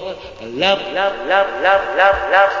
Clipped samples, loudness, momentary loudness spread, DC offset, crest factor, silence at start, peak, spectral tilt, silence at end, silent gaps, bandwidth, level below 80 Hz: under 0.1%; -15 LUFS; 14 LU; under 0.1%; 16 dB; 0 s; -2 dBFS; -4 dB/octave; 0 s; none; 7.6 kHz; -44 dBFS